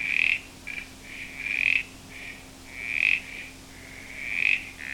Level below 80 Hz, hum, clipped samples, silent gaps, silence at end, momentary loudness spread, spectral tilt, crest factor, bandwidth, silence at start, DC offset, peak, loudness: -54 dBFS; none; under 0.1%; none; 0 s; 19 LU; -1.5 dB/octave; 22 dB; 19 kHz; 0 s; under 0.1%; -8 dBFS; -25 LUFS